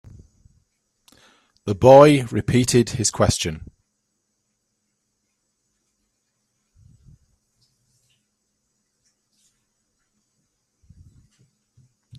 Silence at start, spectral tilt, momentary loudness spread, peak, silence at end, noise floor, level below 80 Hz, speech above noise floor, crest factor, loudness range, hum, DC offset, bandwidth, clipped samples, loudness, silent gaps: 1.65 s; -5 dB/octave; 18 LU; 0 dBFS; 8.6 s; -74 dBFS; -48 dBFS; 58 dB; 24 dB; 11 LU; none; under 0.1%; 13.5 kHz; under 0.1%; -16 LUFS; none